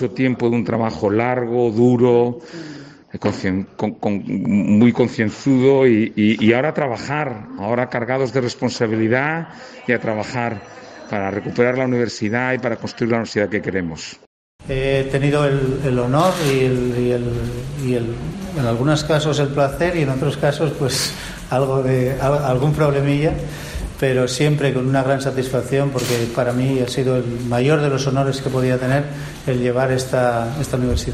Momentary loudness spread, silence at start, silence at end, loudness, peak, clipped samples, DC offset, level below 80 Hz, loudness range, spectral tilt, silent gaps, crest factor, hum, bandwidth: 10 LU; 0 s; 0 s; -19 LUFS; -2 dBFS; under 0.1%; under 0.1%; -40 dBFS; 4 LU; -6 dB/octave; 14.27-14.59 s; 18 dB; none; 14 kHz